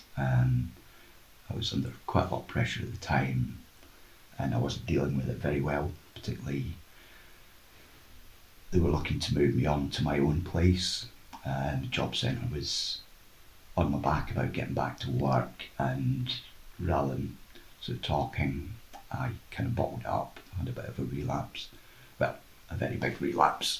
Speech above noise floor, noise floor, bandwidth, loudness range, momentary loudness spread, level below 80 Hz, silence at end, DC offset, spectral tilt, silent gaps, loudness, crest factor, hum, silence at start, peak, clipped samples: 26 dB; -56 dBFS; 16 kHz; 6 LU; 13 LU; -44 dBFS; 0 s; under 0.1%; -6 dB/octave; none; -32 LUFS; 24 dB; none; 0 s; -8 dBFS; under 0.1%